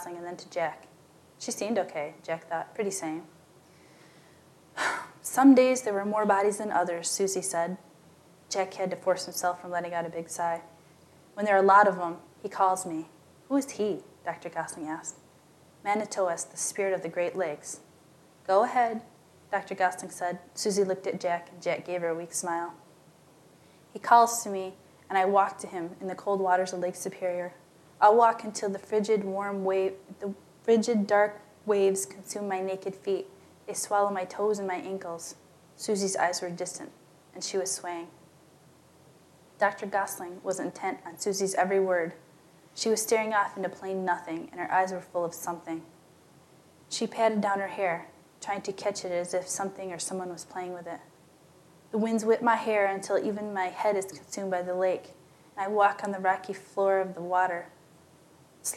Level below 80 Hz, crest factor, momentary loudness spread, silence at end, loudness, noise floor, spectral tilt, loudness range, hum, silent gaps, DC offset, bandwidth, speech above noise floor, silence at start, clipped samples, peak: -82 dBFS; 24 dB; 14 LU; 0 s; -29 LUFS; -58 dBFS; -4 dB/octave; 8 LU; none; none; under 0.1%; 15 kHz; 29 dB; 0 s; under 0.1%; -6 dBFS